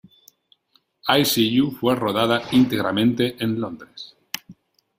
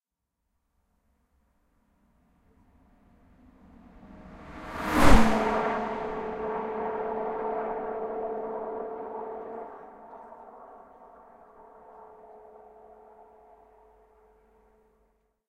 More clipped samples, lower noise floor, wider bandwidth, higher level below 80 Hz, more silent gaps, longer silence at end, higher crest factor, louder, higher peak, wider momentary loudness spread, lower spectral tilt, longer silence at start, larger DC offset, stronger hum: neither; second, -64 dBFS vs -83 dBFS; first, 16 kHz vs 14.5 kHz; second, -58 dBFS vs -38 dBFS; neither; second, 0.45 s vs 3.1 s; second, 20 dB vs 28 dB; first, -20 LUFS vs -29 LUFS; about the same, -2 dBFS vs -2 dBFS; second, 15 LU vs 28 LU; about the same, -4.5 dB/octave vs -5.5 dB/octave; second, 1.05 s vs 4.05 s; neither; neither